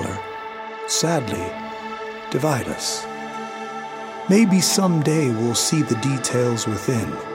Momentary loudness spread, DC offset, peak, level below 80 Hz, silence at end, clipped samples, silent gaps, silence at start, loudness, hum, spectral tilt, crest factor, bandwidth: 14 LU; under 0.1%; -4 dBFS; -56 dBFS; 0 s; under 0.1%; none; 0 s; -21 LUFS; none; -4.5 dB/octave; 18 dB; 16.5 kHz